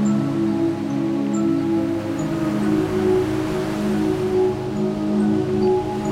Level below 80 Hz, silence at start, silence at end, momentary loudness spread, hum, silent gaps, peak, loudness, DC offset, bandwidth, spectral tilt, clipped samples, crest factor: -44 dBFS; 0 s; 0 s; 4 LU; none; none; -8 dBFS; -21 LUFS; under 0.1%; 15 kHz; -7.5 dB/octave; under 0.1%; 12 dB